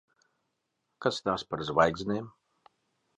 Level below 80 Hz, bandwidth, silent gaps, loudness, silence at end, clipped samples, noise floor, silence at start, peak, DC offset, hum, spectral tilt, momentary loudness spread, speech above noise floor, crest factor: -60 dBFS; 11 kHz; none; -30 LUFS; 0.9 s; under 0.1%; -81 dBFS; 1 s; -8 dBFS; under 0.1%; none; -5 dB/octave; 9 LU; 52 dB; 24 dB